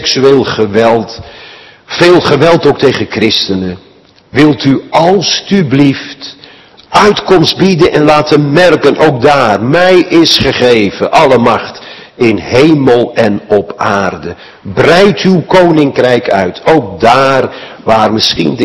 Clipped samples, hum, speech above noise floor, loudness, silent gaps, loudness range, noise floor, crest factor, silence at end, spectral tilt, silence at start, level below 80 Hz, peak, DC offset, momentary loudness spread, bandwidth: 5%; none; 29 dB; -8 LUFS; none; 3 LU; -36 dBFS; 8 dB; 0 s; -5.5 dB/octave; 0 s; -40 dBFS; 0 dBFS; under 0.1%; 12 LU; 12 kHz